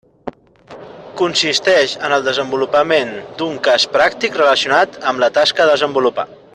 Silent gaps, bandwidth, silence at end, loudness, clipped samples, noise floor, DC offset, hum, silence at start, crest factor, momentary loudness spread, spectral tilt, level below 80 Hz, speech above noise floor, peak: none; 10.5 kHz; 0.3 s; -15 LUFS; under 0.1%; -40 dBFS; under 0.1%; none; 0.25 s; 16 dB; 13 LU; -2.5 dB/octave; -58 dBFS; 25 dB; 0 dBFS